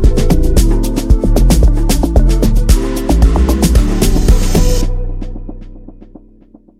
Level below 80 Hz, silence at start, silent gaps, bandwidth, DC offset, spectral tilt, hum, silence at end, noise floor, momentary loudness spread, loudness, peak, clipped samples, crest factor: -12 dBFS; 0 s; none; 15.5 kHz; under 0.1%; -6 dB/octave; none; 0.75 s; -42 dBFS; 11 LU; -13 LUFS; 0 dBFS; under 0.1%; 10 dB